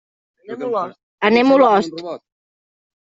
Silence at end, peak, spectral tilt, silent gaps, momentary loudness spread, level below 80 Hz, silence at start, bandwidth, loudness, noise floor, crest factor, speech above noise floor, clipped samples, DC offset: 0.85 s; -2 dBFS; -5.5 dB/octave; 1.03-1.18 s; 20 LU; -62 dBFS; 0.5 s; 7.8 kHz; -16 LUFS; under -90 dBFS; 16 dB; over 74 dB; under 0.1%; under 0.1%